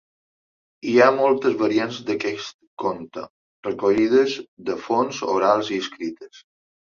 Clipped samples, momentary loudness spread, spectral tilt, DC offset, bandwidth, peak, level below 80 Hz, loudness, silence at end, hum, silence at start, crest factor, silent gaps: under 0.1%; 17 LU; -5 dB/octave; under 0.1%; 7.4 kHz; -2 dBFS; -64 dBFS; -21 LUFS; 0.55 s; none; 0.85 s; 20 dB; 2.54-2.59 s, 2.67-2.77 s, 3.30-3.63 s, 4.48-4.57 s